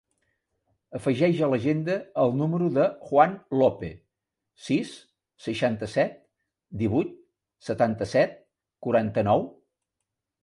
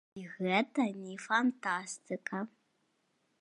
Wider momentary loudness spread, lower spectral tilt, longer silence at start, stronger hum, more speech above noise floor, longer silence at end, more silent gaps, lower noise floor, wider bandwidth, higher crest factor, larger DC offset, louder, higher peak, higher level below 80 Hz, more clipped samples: first, 15 LU vs 12 LU; first, -7.5 dB/octave vs -4.5 dB/octave; first, 0.9 s vs 0.15 s; neither; first, 60 dB vs 43 dB; about the same, 0.95 s vs 0.95 s; neither; first, -85 dBFS vs -77 dBFS; about the same, 11.5 kHz vs 10.5 kHz; about the same, 22 dB vs 22 dB; neither; first, -25 LUFS vs -34 LUFS; first, -6 dBFS vs -14 dBFS; first, -58 dBFS vs -86 dBFS; neither